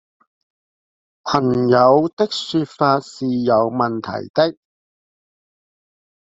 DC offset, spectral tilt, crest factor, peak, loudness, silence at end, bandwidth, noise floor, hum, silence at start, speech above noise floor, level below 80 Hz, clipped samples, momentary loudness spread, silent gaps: under 0.1%; -6.5 dB/octave; 18 dB; -2 dBFS; -18 LUFS; 1.75 s; 7.8 kHz; under -90 dBFS; none; 1.25 s; over 73 dB; -58 dBFS; under 0.1%; 9 LU; 2.13-2.17 s, 4.30-4.34 s